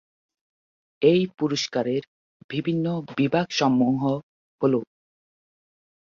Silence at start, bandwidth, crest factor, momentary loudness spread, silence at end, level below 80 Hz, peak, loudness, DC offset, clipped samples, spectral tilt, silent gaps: 1 s; 7.4 kHz; 20 dB; 8 LU; 1.2 s; -66 dBFS; -6 dBFS; -24 LUFS; under 0.1%; under 0.1%; -6 dB/octave; 2.07-2.49 s, 4.23-4.59 s